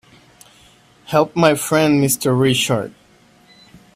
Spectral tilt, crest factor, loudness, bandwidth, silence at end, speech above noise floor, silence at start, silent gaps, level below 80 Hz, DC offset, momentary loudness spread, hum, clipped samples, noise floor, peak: -4.5 dB/octave; 18 dB; -16 LUFS; 16 kHz; 1.05 s; 36 dB; 1.1 s; none; -56 dBFS; under 0.1%; 6 LU; none; under 0.1%; -51 dBFS; 0 dBFS